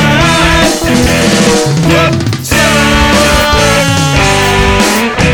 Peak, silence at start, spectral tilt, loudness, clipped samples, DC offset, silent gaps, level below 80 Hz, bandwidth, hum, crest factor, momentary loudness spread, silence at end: 0 dBFS; 0 s; -4 dB/octave; -8 LUFS; 0.1%; under 0.1%; none; -20 dBFS; over 20 kHz; none; 8 dB; 2 LU; 0 s